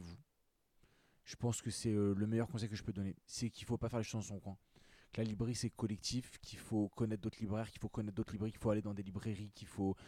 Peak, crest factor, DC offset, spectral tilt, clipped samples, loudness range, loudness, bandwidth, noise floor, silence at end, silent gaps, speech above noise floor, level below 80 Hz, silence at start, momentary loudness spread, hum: -26 dBFS; 16 dB; under 0.1%; -6 dB/octave; under 0.1%; 2 LU; -41 LUFS; 14.5 kHz; -80 dBFS; 0 s; none; 40 dB; -64 dBFS; 0 s; 12 LU; none